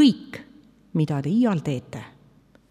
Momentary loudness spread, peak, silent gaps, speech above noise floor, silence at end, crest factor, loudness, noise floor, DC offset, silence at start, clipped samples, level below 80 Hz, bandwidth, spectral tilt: 19 LU; -6 dBFS; none; 31 dB; 0.65 s; 18 dB; -24 LUFS; -56 dBFS; under 0.1%; 0 s; under 0.1%; -62 dBFS; 12 kHz; -7 dB/octave